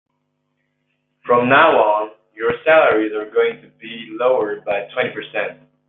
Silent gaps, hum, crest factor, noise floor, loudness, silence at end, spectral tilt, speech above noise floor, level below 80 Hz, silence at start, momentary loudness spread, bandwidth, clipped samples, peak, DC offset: none; none; 18 dB; -71 dBFS; -17 LUFS; 0.35 s; -8 dB/octave; 54 dB; -64 dBFS; 1.25 s; 19 LU; 4.1 kHz; under 0.1%; 0 dBFS; under 0.1%